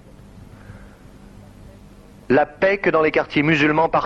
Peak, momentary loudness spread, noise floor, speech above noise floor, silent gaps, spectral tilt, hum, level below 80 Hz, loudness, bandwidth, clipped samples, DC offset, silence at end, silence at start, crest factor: -6 dBFS; 3 LU; -44 dBFS; 27 dB; none; -6.5 dB/octave; none; -48 dBFS; -18 LUFS; 7.8 kHz; under 0.1%; under 0.1%; 0 s; 0.35 s; 16 dB